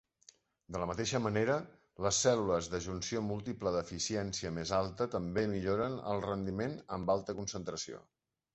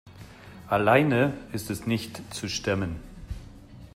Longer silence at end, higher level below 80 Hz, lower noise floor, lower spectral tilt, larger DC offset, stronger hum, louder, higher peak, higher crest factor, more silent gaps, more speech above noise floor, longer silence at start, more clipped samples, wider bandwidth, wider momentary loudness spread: first, 0.55 s vs 0.05 s; second, -58 dBFS vs -48 dBFS; first, -65 dBFS vs -46 dBFS; about the same, -4.5 dB/octave vs -5.5 dB/octave; neither; neither; second, -35 LUFS vs -26 LUFS; second, -16 dBFS vs -6 dBFS; about the same, 20 dB vs 22 dB; neither; first, 30 dB vs 21 dB; first, 0.7 s vs 0.05 s; neither; second, 8.2 kHz vs 16 kHz; second, 8 LU vs 21 LU